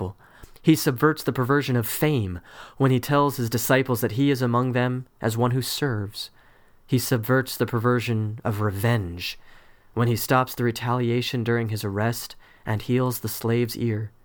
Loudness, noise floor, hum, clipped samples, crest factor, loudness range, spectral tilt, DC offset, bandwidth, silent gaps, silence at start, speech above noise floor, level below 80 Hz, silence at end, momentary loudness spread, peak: -24 LUFS; -53 dBFS; none; under 0.1%; 18 dB; 3 LU; -6 dB/octave; under 0.1%; over 20 kHz; none; 0 s; 30 dB; -54 dBFS; 0.15 s; 9 LU; -6 dBFS